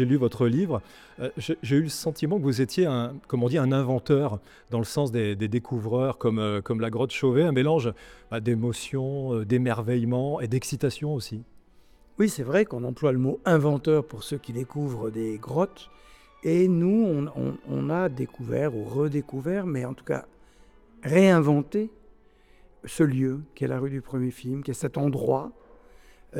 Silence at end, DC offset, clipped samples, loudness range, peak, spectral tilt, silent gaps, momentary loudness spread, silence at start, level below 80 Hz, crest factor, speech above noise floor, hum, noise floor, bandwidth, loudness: 0 s; under 0.1%; under 0.1%; 3 LU; -8 dBFS; -7 dB/octave; none; 11 LU; 0 s; -58 dBFS; 18 dB; 31 dB; none; -56 dBFS; 16 kHz; -26 LUFS